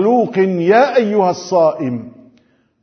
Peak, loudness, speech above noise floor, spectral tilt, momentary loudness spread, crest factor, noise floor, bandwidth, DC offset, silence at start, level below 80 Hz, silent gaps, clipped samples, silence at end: 0 dBFS; -14 LUFS; 41 dB; -6.5 dB/octave; 11 LU; 14 dB; -55 dBFS; 6.6 kHz; under 0.1%; 0 s; -66 dBFS; none; under 0.1%; 0.75 s